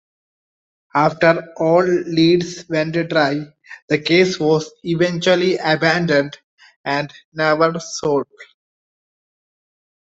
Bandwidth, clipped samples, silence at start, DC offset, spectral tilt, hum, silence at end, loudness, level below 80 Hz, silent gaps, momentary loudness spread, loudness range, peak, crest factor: 8 kHz; under 0.1%; 0.95 s; under 0.1%; -5.5 dB/octave; none; 1.65 s; -17 LUFS; -60 dBFS; 3.82-3.88 s, 6.44-6.58 s, 6.76-6.84 s, 7.25-7.32 s; 8 LU; 5 LU; -2 dBFS; 18 dB